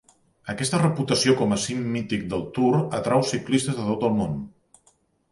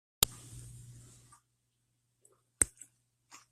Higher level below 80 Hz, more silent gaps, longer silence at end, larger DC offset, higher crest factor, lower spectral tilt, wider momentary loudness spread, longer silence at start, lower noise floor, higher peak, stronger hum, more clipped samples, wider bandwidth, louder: about the same, -54 dBFS vs -58 dBFS; neither; about the same, 0.8 s vs 0.85 s; neither; second, 18 dB vs 36 dB; first, -5 dB/octave vs -1 dB/octave; second, 9 LU vs 25 LU; first, 0.45 s vs 0.2 s; second, -64 dBFS vs -79 dBFS; about the same, -6 dBFS vs -4 dBFS; neither; neither; second, 11.5 kHz vs 15.5 kHz; first, -24 LUFS vs -32 LUFS